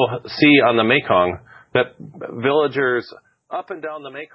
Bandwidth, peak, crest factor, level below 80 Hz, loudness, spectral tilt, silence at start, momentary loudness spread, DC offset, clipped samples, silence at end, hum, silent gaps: 5.8 kHz; 0 dBFS; 18 dB; -54 dBFS; -17 LUFS; -8.5 dB/octave; 0 s; 18 LU; under 0.1%; under 0.1%; 0.1 s; none; none